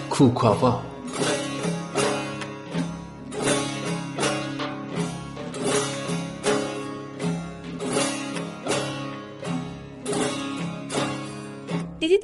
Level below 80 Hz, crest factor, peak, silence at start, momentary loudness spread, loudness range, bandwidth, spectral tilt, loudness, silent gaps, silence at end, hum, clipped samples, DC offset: -54 dBFS; 22 dB; -4 dBFS; 0 s; 11 LU; 3 LU; 11.5 kHz; -4.5 dB/octave; -27 LUFS; none; 0 s; none; under 0.1%; under 0.1%